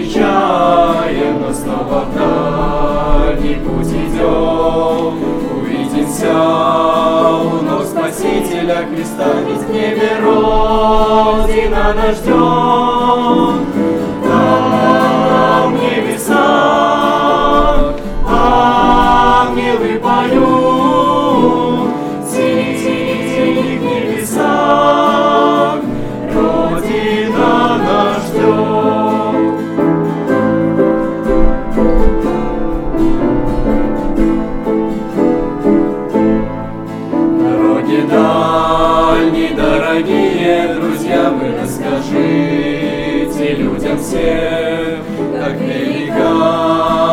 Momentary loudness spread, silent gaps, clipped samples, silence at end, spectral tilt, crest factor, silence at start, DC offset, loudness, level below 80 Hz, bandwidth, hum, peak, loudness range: 7 LU; none; under 0.1%; 0 s; -6 dB/octave; 12 dB; 0 s; under 0.1%; -13 LUFS; -24 dBFS; 16 kHz; none; 0 dBFS; 4 LU